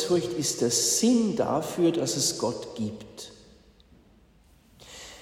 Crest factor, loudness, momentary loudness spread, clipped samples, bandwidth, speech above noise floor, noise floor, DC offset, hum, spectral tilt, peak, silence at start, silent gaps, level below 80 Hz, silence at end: 16 dB; -25 LUFS; 21 LU; under 0.1%; 16 kHz; 32 dB; -58 dBFS; under 0.1%; none; -3.5 dB/octave; -12 dBFS; 0 s; none; -60 dBFS; 0 s